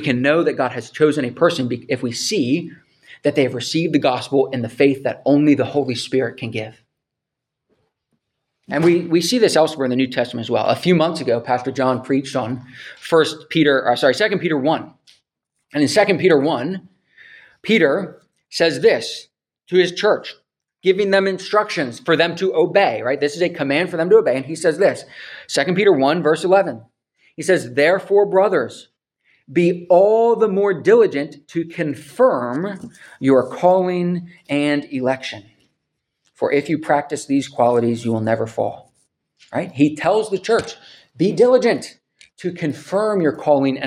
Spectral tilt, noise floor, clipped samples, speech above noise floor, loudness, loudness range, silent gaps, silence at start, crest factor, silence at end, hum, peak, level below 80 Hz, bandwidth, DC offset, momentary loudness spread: -5.5 dB/octave; -82 dBFS; under 0.1%; 64 dB; -18 LUFS; 4 LU; none; 0 s; 18 dB; 0 s; none; 0 dBFS; -66 dBFS; 14 kHz; under 0.1%; 12 LU